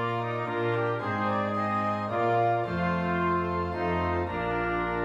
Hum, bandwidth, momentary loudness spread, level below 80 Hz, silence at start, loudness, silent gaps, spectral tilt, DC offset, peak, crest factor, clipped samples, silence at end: none; 8 kHz; 4 LU; -50 dBFS; 0 s; -28 LUFS; none; -8 dB/octave; under 0.1%; -14 dBFS; 12 dB; under 0.1%; 0 s